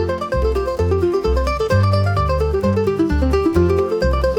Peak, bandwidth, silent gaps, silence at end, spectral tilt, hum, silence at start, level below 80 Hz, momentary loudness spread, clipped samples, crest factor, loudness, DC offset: -4 dBFS; 13.5 kHz; none; 0 s; -7.5 dB/octave; none; 0 s; -24 dBFS; 4 LU; under 0.1%; 12 dB; -18 LUFS; under 0.1%